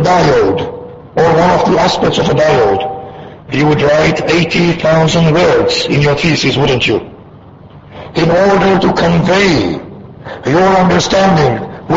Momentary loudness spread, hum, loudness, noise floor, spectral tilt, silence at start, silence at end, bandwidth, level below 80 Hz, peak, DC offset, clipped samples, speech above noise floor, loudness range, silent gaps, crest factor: 12 LU; none; -11 LUFS; -35 dBFS; -5.5 dB/octave; 0 s; 0 s; 8 kHz; -34 dBFS; 0 dBFS; under 0.1%; under 0.1%; 26 dB; 2 LU; none; 10 dB